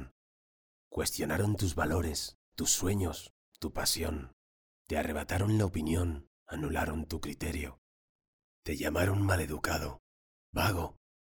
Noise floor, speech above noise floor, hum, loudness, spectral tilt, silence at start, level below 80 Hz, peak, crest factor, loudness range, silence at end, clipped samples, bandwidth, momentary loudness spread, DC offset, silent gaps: under -90 dBFS; over 58 dB; none; -33 LUFS; -4.5 dB/octave; 0 s; -46 dBFS; -14 dBFS; 20 dB; 3 LU; 0.35 s; under 0.1%; over 20 kHz; 13 LU; under 0.1%; 0.11-0.91 s, 2.35-2.52 s, 3.30-3.52 s, 4.33-4.85 s, 6.27-6.46 s, 7.78-8.19 s, 8.28-8.63 s, 9.99-10.53 s